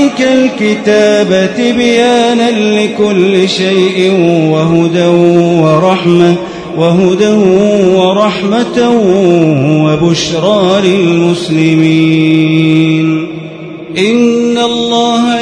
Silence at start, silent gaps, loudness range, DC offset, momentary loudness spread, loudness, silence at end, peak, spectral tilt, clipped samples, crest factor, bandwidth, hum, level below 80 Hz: 0 s; none; 1 LU; under 0.1%; 3 LU; -8 LUFS; 0 s; 0 dBFS; -6 dB/octave; 1%; 8 dB; 10.5 kHz; none; -46 dBFS